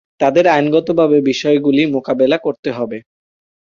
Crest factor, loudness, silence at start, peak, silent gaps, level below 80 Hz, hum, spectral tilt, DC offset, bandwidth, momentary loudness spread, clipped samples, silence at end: 14 dB; -14 LUFS; 0.2 s; -2 dBFS; 2.59-2.63 s; -56 dBFS; none; -6 dB/octave; under 0.1%; 7.4 kHz; 10 LU; under 0.1%; 0.7 s